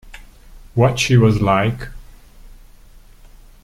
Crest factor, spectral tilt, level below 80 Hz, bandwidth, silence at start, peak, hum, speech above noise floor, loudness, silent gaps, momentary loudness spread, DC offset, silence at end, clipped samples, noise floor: 18 dB; -6 dB/octave; -38 dBFS; 13.5 kHz; 0.05 s; -2 dBFS; 50 Hz at -50 dBFS; 29 dB; -16 LUFS; none; 15 LU; under 0.1%; 1.15 s; under 0.1%; -43 dBFS